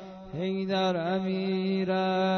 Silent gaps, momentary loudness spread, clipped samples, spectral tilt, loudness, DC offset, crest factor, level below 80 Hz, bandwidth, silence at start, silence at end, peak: none; 6 LU; under 0.1%; -7 dB/octave; -29 LUFS; under 0.1%; 12 dB; -62 dBFS; 6.4 kHz; 0 s; 0 s; -16 dBFS